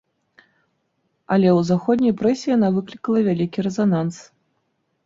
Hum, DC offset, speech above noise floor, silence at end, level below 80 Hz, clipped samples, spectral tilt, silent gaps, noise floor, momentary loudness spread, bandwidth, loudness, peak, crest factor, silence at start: none; under 0.1%; 52 dB; 0.85 s; -60 dBFS; under 0.1%; -7.5 dB/octave; none; -70 dBFS; 7 LU; 7.8 kHz; -20 LUFS; -6 dBFS; 14 dB; 1.3 s